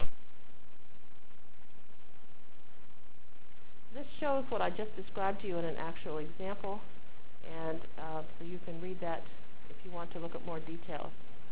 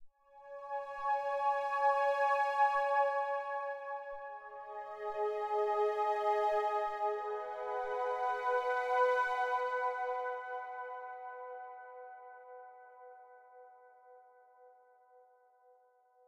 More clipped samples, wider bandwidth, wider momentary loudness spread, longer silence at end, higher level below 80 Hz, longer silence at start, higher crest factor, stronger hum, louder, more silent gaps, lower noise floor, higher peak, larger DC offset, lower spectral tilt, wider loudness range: neither; second, 4 kHz vs 10.5 kHz; first, 26 LU vs 20 LU; second, 0 s vs 1.55 s; first, -58 dBFS vs -78 dBFS; about the same, 0 s vs 0 s; first, 24 dB vs 16 dB; neither; second, -40 LUFS vs -35 LUFS; neither; second, -62 dBFS vs -68 dBFS; first, -12 dBFS vs -20 dBFS; first, 4% vs under 0.1%; first, -9 dB/octave vs -2 dB/octave; second, 6 LU vs 16 LU